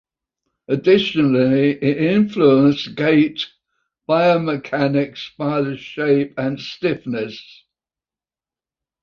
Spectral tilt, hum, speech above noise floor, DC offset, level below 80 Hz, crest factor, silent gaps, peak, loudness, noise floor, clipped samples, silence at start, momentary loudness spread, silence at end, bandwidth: -7.5 dB/octave; none; over 73 dB; under 0.1%; -60 dBFS; 16 dB; none; -2 dBFS; -18 LUFS; under -90 dBFS; under 0.1%; 0.7 s; 11 LU; 1.6 s; 6.8 kHz